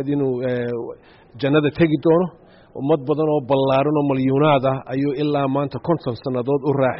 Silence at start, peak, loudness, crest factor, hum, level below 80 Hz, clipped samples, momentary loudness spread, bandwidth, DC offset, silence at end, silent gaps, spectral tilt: 0 s; -4 dBFS; -20 LUFS; 14 dB; none; -54 dBFS; under 0.1%; 9 LU; 5.8 kHz; under 0.1%; 0 s; none; -6.5 dB/octave